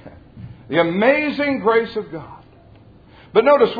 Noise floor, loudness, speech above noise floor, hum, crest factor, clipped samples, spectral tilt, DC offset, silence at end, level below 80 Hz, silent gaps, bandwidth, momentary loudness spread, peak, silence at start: -46 dBFS; -18 LUFS; 30 dB; none; 18 dB; under 0.1%; -8 dB/octave; under 0.1%; 0 s; -54 dBFS; none; 5 kHz; 19 LU; 0 dBFS; 0.05 s